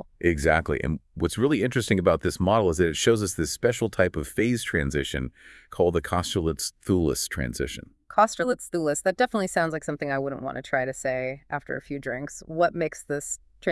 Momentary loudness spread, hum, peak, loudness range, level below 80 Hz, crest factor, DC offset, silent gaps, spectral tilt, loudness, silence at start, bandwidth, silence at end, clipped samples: 10 LU; none; -6 dBFS; 5 LU; -44 dBFS; 20 dB; under 0.1%; none; -5 dB/octave; -26 LUFS; 0.2 s; 12 kHz; 0 s; under 0.1%